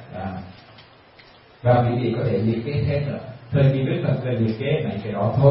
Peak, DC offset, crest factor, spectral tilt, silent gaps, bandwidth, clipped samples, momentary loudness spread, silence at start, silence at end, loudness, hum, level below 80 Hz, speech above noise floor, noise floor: -2 dBFS; under 0.1%; 20 dB; -12.5 dB/octave; none; 5.6 kHz; under 0.1%; 13 LU; 0 s; 0 s; -22 LUFS; none; -48 dBFS; 29 dB; -49 dBFS